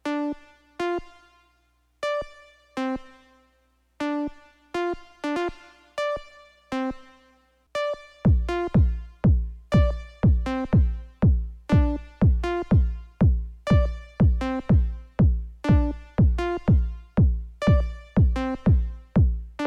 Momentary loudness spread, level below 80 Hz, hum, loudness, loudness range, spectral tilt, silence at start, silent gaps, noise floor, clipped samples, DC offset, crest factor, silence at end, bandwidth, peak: 10 LU; -28 dBFS; 60 Hz at -40 dBFS; -25 LUFS; 9 LU; -8.5 dB/octave; 0.05 s; none; -66 dBFS; under 0.1%; under 0.1%; 16 dB; 0 s; 8 kHz; -8 dBFS